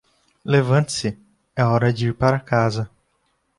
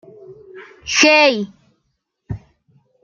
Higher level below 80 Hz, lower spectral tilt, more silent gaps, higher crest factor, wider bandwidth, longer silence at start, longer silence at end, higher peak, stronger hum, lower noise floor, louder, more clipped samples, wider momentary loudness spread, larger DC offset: about the same, -50 dBFS vs -50 dBFS; first, -6 dB/octave vs -2.5 dB/octave; neither; about the same, 18 dB vs 20 dB; first, 11.5 kHz vs 7.4 kHz; first, 0.45 s vs 0.3 s; about the same, 0.7 s vs 0.65 s; second, -4 dBFS vs 0 dBFS; neither; about the same, -68 dBFS vs -71 dBFS; second, -20 LUFS vs -13 LUFS; neither; second, 15 LU vs 23 LU; neither